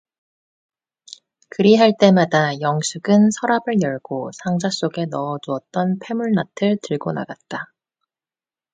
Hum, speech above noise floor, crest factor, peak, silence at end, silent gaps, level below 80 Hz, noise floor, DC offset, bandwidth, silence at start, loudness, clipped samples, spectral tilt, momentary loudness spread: none; over 72 dB; 20 dB; 0 dBFS; 1.1 s; none; -64 dBFS; under -90 dBFS; under 0.1%; 9.4 kHz; 1.6 s; -19 LUFS; under 0.1%; -5.5 dB/octave; 15 LU